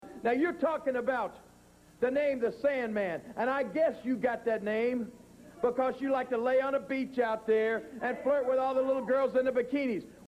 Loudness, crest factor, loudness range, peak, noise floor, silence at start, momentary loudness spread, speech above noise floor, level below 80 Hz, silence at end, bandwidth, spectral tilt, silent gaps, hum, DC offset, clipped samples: -31 LUFS; 14 dB; 2 LU; -16 dBFS; -59 dBFS; 0 s; 5 LU; 28 dB; -68 dBFS; 0.1 s; 11.5 kHz; -6.5 dB/octave; none; 60 Hz at -65 dBFS; under 0.1%; under 0.1%